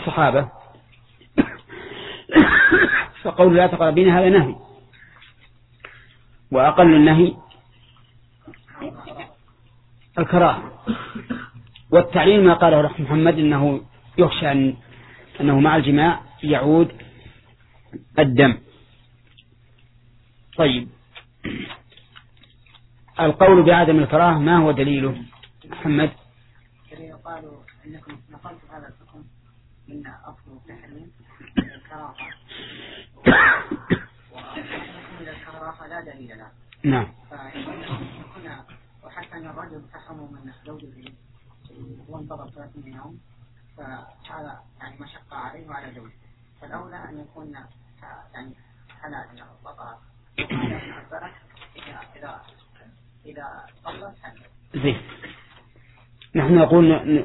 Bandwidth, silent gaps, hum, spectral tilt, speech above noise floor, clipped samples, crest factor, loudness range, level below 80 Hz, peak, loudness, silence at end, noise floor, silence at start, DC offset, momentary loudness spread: 4.1 kHz; none; none; -10.5 dB/octave; 34 dB; under 0.1%; 22 dB; 24 LU; -48 dBFS; 0 dBFS; -17 LUFS; 0 s; -53 dBFS; 0 s; under 0.1%; 27 LU